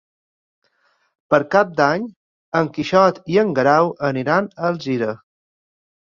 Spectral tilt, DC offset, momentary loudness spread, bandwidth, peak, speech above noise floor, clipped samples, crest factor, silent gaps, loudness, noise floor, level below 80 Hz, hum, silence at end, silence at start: -6.5 dB/octave; under 0.1%; 8 LU; 7.2 kHz; -2 dBFS; 46 dB; under 0.1%; 18 dB; 2.16-2.52 s; -18 LUFS; -64 dBFS; -62 dBFS; none; 0.95 s; 1.3 s